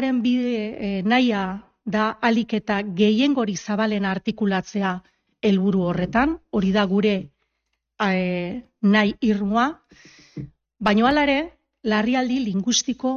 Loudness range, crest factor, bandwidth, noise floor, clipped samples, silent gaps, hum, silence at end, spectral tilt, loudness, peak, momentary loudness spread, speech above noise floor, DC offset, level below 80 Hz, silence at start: 1 LU; 16 dB; 7.2 kHz; -77 dBFS; under 0.1%; none; none; 0 s; -5 dB/octave; -22 LUFS; -6 dBFS; 9 LU; 55 dB; under 0.1%; -52 dBFS; 0 s